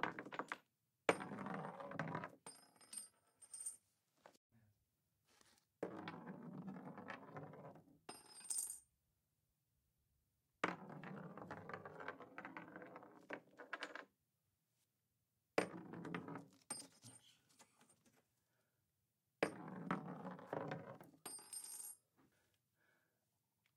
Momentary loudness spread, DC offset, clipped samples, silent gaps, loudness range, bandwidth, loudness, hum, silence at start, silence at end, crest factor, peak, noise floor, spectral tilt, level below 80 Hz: 17 LU; under 0.1%; under 0.1%; 4.37-4.50 s; 8 LU; 15.5 kHz; -50 LUFS; none; 0 s; 1.5 s; 32 dB; -20 dBFS; -88 dBFS; -3.5 dB/octave; under -90 dBFS